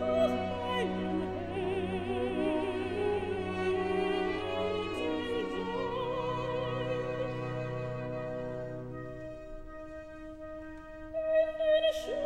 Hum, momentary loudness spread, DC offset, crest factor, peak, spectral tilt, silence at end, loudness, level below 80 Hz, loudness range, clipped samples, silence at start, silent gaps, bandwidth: none; 15 LU; 0.2%; 16 dB; -16 dBFS; -6.5 dB/octave; 0 s; -33 LUFS; -54 dBFS; 7 LU; under 0.1%; 0 s; none; 12.5 kHz